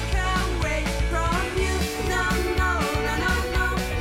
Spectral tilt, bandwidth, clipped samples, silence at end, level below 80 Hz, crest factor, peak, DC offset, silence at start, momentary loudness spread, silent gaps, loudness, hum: -4.5 dB/octave; 16.5 kHz; under 0.1%; 0 s; -28 dBFS; 14 dB; -8 dBFS; under 0.1%; 0 s; 2 LU; none; -24 LUFS; none